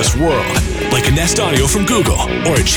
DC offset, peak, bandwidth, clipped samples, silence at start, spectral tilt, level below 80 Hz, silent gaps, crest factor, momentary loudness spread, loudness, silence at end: under 0.1%; -2 dBFS; over 20 kHz; under 0.1%; 0 s; -4 dB/octave; -22 dBFS; none; 12 dB; 3 LU; -14 LUFS; 0 s